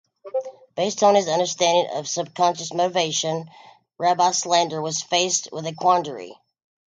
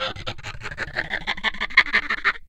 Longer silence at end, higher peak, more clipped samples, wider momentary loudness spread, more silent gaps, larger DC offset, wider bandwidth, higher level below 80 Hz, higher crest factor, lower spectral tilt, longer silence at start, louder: first, 0.55 s vs 0 s; second, -4 dBFS vs 0 dBFS; neither; second, 12 LU vs 16 LU; neither; neither; second, 9.6 kHz vs 12 kHz; second, -74 dBFS vs -42 dBFS; second, 18 dB vs 24 dB; about the same, -2.5 dB/octave vs -3 dB/octave; first, 0.25 s vs 0 s; about the same, -21 LUFS vs -22 LUFS